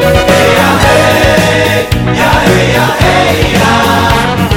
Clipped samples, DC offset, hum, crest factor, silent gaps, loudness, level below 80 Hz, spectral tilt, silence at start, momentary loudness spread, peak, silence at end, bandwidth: 3%; under 0.1%; none; 8 dB; none; -7 LUFS; -22 dBFS; -5 dB/octave; 0 s; 3 LU; 0 dBFS; 0 s; over 20 kHz